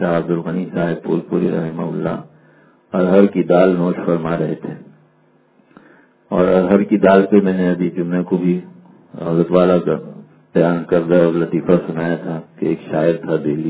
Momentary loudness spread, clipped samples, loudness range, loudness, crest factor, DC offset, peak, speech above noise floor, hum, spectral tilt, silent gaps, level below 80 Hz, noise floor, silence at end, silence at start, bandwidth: 11 LU; under 0.1%; 3 LU; -17 LUFS; 16 dB; under 0.1%; 0 dBFS; 39 dB; none; -12 dB/octave; none; -52 dBFS; -55 dBFS; 0 s; 0 s; 4 kHz